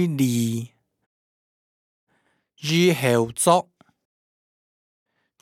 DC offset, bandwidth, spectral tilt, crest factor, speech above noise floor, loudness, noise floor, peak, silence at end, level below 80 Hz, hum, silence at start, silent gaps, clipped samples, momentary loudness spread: under 0.1%; 19 kHz; -5 dB/octave; 22 dB; 48 dB; -21 LUFS; -69 dBFS; -2 dBFS; 1.8 s; -68 dBFS; none; 0 s; 1.06-2.07 s; under 0.1%; 13 LU